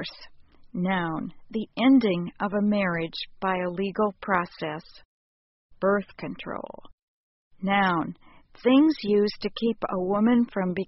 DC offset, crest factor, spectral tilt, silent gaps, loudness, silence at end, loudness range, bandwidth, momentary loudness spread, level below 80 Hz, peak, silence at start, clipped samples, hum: under 0.1%; 18 dB; -5 dB/octave; 5.05-5.70 s, 6.93-7.51 s; -25 LUFS; 0.05 s; 6 LU; 5.8 kHz; 15 LU; -58 dBFS; -8 dBFS; 0 s; under 0.1%; none